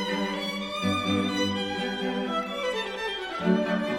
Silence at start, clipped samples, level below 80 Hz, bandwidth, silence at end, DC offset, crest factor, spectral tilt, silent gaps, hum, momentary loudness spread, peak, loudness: 0 s; under 0.1%; -60 dBFS; 16 kHz; 0 s; under 0.1%; 16 dB; -5 dB/octave; none; none; 5 LU; -12 dBFS; -28 LUFS